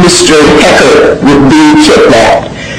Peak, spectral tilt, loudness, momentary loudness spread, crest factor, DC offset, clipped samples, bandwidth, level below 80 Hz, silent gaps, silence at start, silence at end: 0 dBFS; -4 dB/octave; -3 LUFS; 2 LU; 4 dB; 1%; 3%; 15.5 kHz; -26 dBFS; none; 0 s; 0 s